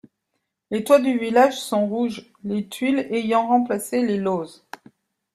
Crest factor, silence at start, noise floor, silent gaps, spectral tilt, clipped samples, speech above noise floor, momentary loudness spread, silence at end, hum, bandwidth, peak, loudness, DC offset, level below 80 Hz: 20 dB; 0.7 s; -77 dBFS; none; -5 dB/octave; under 0.1%; 56 dB; 11 LU; 0.85 s; none; 14.5 kHz; -2 dBFS; -21 LUFS; under 0.1%; -66 dBFS